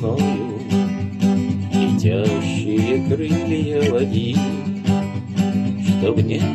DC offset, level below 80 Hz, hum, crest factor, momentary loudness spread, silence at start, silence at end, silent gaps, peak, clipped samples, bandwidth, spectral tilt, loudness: under 0.1%; -54 dBFS; none; 14 dB; 4 LU; 0 s; 0 s; none; -4 dBFS; under 0.1%; 12 kHz; -7 dB/octave; -20 LUFS